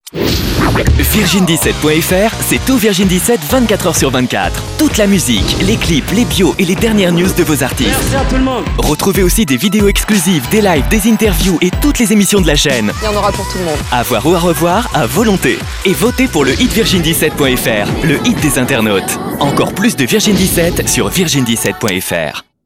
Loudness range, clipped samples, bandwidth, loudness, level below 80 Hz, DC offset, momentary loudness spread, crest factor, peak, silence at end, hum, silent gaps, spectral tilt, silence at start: 1 LU; under 0.1%; 16.5 kHz; -11 LUFS; -22 dBFS; 0.3%; 4 LU; 12 dB; 0 dBFS; 0.25 s; none; none; -4 dB/octave; 0.05 s